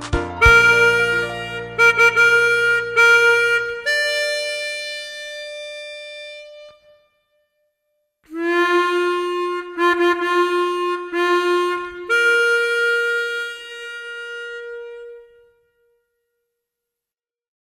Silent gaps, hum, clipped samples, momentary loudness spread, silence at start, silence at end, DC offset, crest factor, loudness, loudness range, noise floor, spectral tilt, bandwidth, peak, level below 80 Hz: none; none; under 0.1%; 19 LU; 0 s; 2.45 s; under 0.1%; 20 dB; -16 LUFS; 19 LU; under -90 dBFS; -3.5 dB/octave; 15.5 kHz; 0 dBFS; -40 dBFS